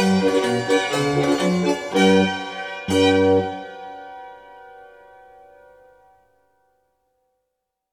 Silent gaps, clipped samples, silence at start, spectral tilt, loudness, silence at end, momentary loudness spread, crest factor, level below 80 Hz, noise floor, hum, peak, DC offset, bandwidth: none; under 0.1%; 0 s; -5.5 dB/octave; -19 LUFS; 3.1 s; 20 LU; 20 dB; -58 dBFS; -79 dBFS; none; -4 dBFS; under 0.1%; 15 kHz